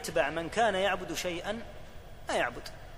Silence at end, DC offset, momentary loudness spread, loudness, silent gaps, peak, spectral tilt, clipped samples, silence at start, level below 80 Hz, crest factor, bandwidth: 0 s; under 0.1%; 19 LU; -31 LUFS; none; -14 dBFS; -3.5 dB/octave; under 0.1%; 0 s; -50 dBFS; 20 dB; 15.5 kHz